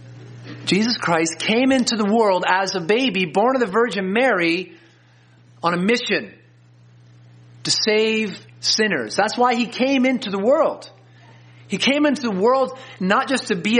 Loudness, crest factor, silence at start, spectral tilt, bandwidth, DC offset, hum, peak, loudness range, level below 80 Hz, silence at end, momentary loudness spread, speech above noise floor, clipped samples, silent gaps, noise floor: -19 LUFS; 18 dB; 0 s; -4 dB/octave; 10 kHz; under 0.1%; none; -2 dBFS; 4 LU; -66 dBFS; 0 s; 8 LU; 33 dB; under 0.1%; none; -52 dBFS